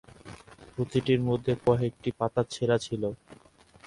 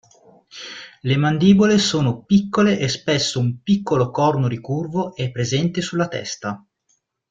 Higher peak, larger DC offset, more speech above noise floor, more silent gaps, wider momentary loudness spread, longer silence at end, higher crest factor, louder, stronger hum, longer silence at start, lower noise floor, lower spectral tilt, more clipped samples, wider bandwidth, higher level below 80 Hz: second, -10 dBFS vs -2 dBFS; neither; second, 21 dB vs 49 dB; neither; first, 22 LU vs 14 LU; second, 0.55 s vs 0.75 s; about the same, 20 dB vs 18 dB; second, -28 LUFS vs -19 LUFS; neither; second, 0.25 s vs 0.55 s; second, -48 dBFS vs -67 dBFS; first, -7 dB/octave vs -5.5 dB/octave; neither; first, 11.5 kHz vs 9 kHz; about the same, -56 dBFS vs -54 dBFS